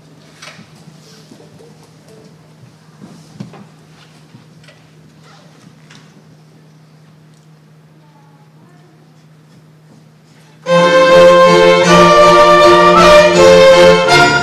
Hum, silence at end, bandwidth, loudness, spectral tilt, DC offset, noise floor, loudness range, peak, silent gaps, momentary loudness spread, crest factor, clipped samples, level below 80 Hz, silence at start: none; 0 s; 14.5 kHz; -6 LUFS; -4.5 dB/octave; under 0.1%; -43 dBFS; 10 LU; 0 dBFS; none; 4 LU; 12 dB; 0.2%; -40 dBFS; 10.65 s